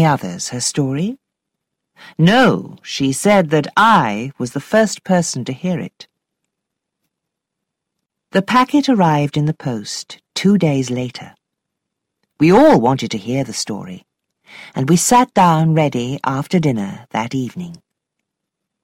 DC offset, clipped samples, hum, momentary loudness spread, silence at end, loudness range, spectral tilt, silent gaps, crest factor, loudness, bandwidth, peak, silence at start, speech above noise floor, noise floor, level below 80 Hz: under 0.1%; under 0.1%; none; 15 LU; 1.1 s; 6 LU; -5 dB/octave; none; 14 dB; -16 LUFS; 16 kHz; -2 dBFS; 0 s; 64 dB; -79 dBFS; -52 dBFS